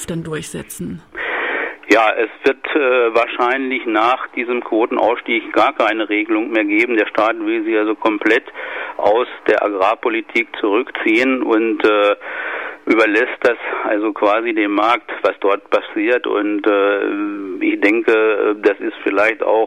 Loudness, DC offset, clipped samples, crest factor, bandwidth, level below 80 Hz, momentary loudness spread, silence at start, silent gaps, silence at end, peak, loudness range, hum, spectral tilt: -16 LUFS; 0.2%; under 0.1%; 14 dB; 15 kHz; -58 dBFS; 8 LU; 0 s; none; 0 s; -2 dBFS; 1 LU; none; -4.5 dB/octave